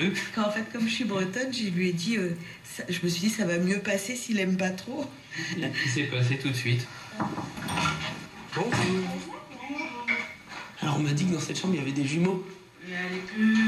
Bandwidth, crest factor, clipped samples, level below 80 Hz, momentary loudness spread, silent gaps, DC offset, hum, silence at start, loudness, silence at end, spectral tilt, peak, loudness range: 14 kHz; 16 dB; under 0.1%; -62 dBFS; 10 LU; none; under 0.1%; none; 0 s; -29 LUFS; 0 s; -5 dB/octave; -14 dBFS; 2 LU